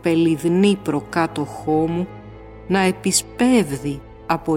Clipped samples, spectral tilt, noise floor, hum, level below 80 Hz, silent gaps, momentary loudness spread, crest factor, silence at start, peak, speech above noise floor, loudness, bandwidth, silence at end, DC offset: under 0.1%; -5 dB/octave; -38 dBFS; none; -46 dBFS; none; 14 LU; 16 dB; 0.05 s; -4 dBFS; 19 dB; -20 LUFS; 17 kHz; 0 s; under 0.1%